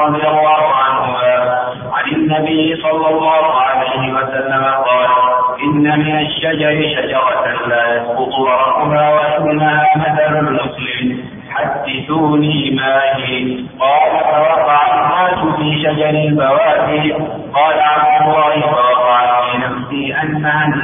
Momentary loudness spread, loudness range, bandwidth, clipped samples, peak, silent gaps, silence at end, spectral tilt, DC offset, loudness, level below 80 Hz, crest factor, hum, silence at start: 7 LU; 2 LU; 3.7 kHz; under 0.1%; -2 dBFS; none; 0 s; -11.5 dB/octave; under 0.1%; -13 LUFS; -48 dBFS; 12 dB; none; 0 s